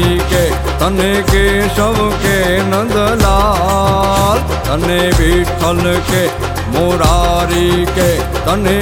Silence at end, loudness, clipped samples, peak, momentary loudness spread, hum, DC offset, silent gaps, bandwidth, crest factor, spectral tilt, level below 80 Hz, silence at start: 0 s; -12 LUFS; under 0.1%; 0 dBFS; 4 LU; none; under 0.1%; none; 17 kHz; 12 dB; -5 dB/octave; -20 dBFS; 0 s